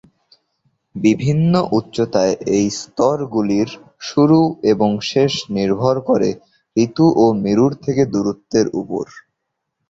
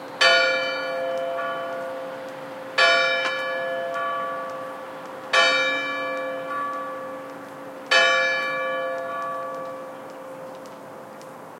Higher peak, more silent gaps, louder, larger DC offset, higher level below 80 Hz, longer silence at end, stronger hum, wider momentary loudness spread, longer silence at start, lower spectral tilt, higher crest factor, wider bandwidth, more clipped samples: first, -2 dBFS vs -6 dBFS; neither; first, -17 LUFS vs -23 LUFS; neither; first, -52 dBFS vs -84 dBFS; first, 0.7 s vs 0 s; neither; second, 9 LU vs 21 LU; first, 0.95 s vs 0 s; first, -6.5 dB/octave vs -1.5 dB/octave; about the same, 16 dB vs 20 dB; second, 8 kHz vs 16.5 kHz; neither